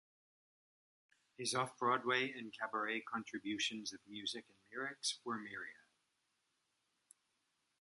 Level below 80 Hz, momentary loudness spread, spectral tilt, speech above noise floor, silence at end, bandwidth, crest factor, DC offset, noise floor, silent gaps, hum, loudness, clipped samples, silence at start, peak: -88 dBFS; 11 LU; -2.5 dB/octave; 42 dB; 2.05 s; 11.5 kHz; 24 dB; under 0.1%; -84 dBFS; none; none; -41 LUFS; under 0.1%; 1.4 s; -20 dBFS